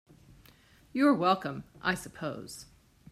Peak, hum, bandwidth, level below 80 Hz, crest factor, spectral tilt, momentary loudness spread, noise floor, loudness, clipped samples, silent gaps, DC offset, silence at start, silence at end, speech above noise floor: -12 dBFS; none; 14.5 kHz; -64 dBFS; 20 dB; -5 dB/octave; 18 LU; -60 dBFS; -30 LUFS; under 0.1%; none; under 0.1%; 0.95 s; 0.5 s; 30 dB